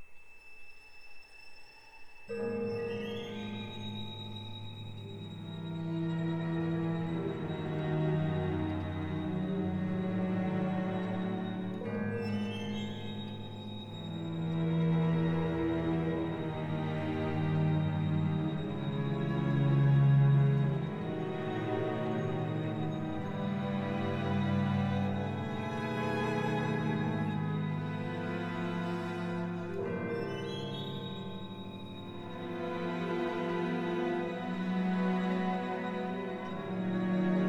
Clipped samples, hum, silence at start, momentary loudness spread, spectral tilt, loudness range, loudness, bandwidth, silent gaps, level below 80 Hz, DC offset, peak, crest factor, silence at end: under 0.1%; none; 0 s; 12 LU; -8.5 dB/octave; 9 LU; -34 LUFS; 8 kHz; none; -60 dBFS; under 0.1%; -18 dBFS; 16 dB; 0 s